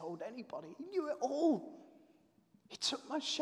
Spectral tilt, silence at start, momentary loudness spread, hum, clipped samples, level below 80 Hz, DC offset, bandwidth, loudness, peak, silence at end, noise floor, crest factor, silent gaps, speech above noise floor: -3 dB/octave; 0 s; 17 LU; none; under 0.1%; under -90 dBFS; under 0.1%; 12 kHz; -38 LUFS; -22 dBFS; 0 s; -70 dBFS; 18 dB; none; 31 dB